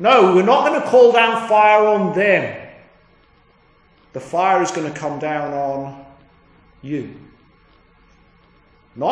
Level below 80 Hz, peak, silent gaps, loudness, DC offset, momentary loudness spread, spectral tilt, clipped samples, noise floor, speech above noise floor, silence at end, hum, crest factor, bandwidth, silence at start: -60 dBFS; 0 dBFS; none; -16 LUFS; under 0.1%; 17 LU; -5 dB/octave; under 0.1%; -54 dBFS; 39 dB; 0 s; none; 18 dB; 10.5 kHz; 0 s